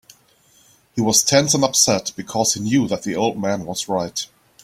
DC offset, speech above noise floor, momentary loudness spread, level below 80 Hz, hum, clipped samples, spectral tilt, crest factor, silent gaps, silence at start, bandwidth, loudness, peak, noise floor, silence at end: under 0.1%; 36 dB; 12 LU; -54 dBFS; none; under 0.1%; -3 dB/octave; 20 dB; none; 0.95 s; 16 kHz; -18 LUFS; 0 dBFS; -55 dBFS; 0.4 s